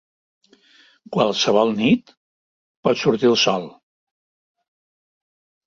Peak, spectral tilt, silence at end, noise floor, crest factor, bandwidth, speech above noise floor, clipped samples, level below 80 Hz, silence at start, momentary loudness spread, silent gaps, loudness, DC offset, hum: -4 dBFS; -4.5 dB/octave; 2 s; -55 dBFS; 20 dB; 7.6 kHz; 36 dB; under 0.1%; -62 dBFS; 1.1 s; 10 LU; 2.17-2.83 s; -19 LUFS; under 0.1%; none